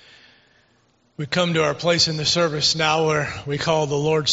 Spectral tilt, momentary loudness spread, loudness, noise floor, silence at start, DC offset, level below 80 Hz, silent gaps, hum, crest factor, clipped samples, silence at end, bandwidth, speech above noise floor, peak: -3 dB/octave; 7 LU; -20 LUFS; -61 dBFS; 1.2 s; under 0.1%; -54 dBFS; none; none; 18 dB; under 0.1%; 0 s; 8 kHz; 41 dB; -4 dBFS